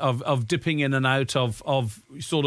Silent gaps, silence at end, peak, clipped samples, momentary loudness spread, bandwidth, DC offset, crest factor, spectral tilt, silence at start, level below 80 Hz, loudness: none; 0 s; -8 dBFS; under 0.1%; 6 LU; 11 kHz; under 0.1%; 16 dB; -5.5 dB/octave; 0 s; -58 dBFS; -25 LUFS